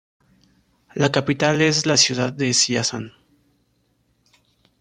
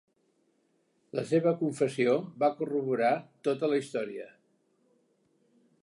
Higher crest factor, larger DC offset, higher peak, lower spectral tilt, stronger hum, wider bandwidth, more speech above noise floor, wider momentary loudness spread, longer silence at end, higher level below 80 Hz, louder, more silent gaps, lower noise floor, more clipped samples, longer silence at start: about the same, 20 dB vs 18 dB; neither; first, -2 dBFS vs -14 dBFS; second, -3 dB/octave vs -6.5 dB/octave; neither; about the same, 12 kHz vs 11.5 kHz; about the same, 46 dB vs 43 dB; first, 14 LU vs 11 LU; first, 1.7 s vs 1.55 s; first, -60 dBFS vs -84 dBFS; first, -18 LUFS vs -30 LUFS; neither; second, -66 dBFS vs -72 dBFS; neither; second, 0.95 s vs 1.15 s